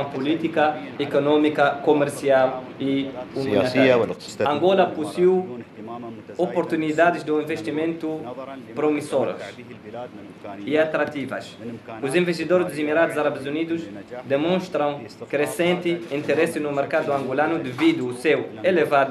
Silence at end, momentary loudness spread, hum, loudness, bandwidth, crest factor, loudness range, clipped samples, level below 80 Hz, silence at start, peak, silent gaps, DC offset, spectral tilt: 0 s; 16 LU; none; -22 LUFS; 13.5 kHz; 18 dB; 5 LU; under 0.1%; -68 dBFS; 0 s; -4 dBFS; none; under 0.1%; -6 dB/octave